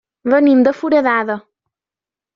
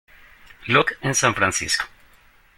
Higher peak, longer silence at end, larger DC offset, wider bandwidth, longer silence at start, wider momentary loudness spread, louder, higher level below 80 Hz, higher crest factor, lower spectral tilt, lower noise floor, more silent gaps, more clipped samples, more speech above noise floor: about the same, -2 dBFS vs -2 dBFS; first, 0.95 s vs 0.7 s; neither; second, 6.8 kHz vs 16.5 kHz; second, 0.25 s vs 0.6 s; about the same, 11 LU vs 10 LU; first, -14 LUFS vs -20 LUFS; second, -62 dBFS vs -52 dBFS; second, 14 dB vs 22 dB; first, -4 dB/octave vs -2.5 dB/octave; first, -89 dBFS vs -54 dBFS; neither; neither; first, 76 dB vs 33 dB